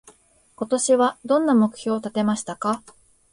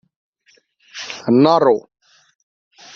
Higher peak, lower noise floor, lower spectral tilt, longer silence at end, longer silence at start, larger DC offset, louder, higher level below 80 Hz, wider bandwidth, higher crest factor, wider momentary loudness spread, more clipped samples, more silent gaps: second, -8 dBFS vs -2 dBFS; about the same, -55 dBFS vs -58 dBFS; second, -4.5 dB/octave vs -6.5 dB/octave; second, 0.55 s vs 1.15 s; second, 0.6 s vs 0.95 s; neither; second, -22 LUFS vs -15 LUFS; about the same, -66 dBFS vs -64 dBFS; first, 11.5 kHz vs 7.4 kHz; about the same, 16 dB vs 18 dB; second, 8 LU vs 19 LU; neither; neither